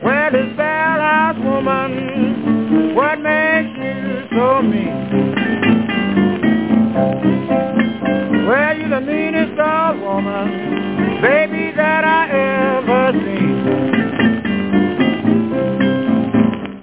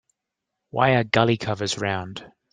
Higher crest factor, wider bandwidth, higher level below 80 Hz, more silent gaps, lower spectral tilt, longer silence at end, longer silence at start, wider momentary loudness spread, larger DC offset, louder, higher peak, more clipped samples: second, 14 dB vs 22 dB; second, 4 kHz vs 9.8 kHz; first, -48 dBFS vs -58 dBFS; neither; first, -10.5 dB/octave vs -5 dB/octave; second, 0 s vs 0.25 s; second, 0 s vs 0.75 s; second, 5 LU vs 15 LU; first, 0.3% vs under 0.1%; first, -16 LUFS vs -22 LUFS; about the same, -2 dBFS vs -2 dBFS; neither